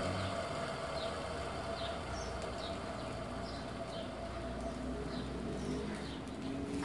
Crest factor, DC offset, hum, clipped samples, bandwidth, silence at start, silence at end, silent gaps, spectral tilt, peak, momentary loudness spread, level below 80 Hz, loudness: 14 dB; under 0.1%; none; under 0.1%; 11.5 kHz; 0 s; 0 s; none; -5.5 dB/octave; -26 dBFS; 4 LU; -52 dBFS; -41 LUFS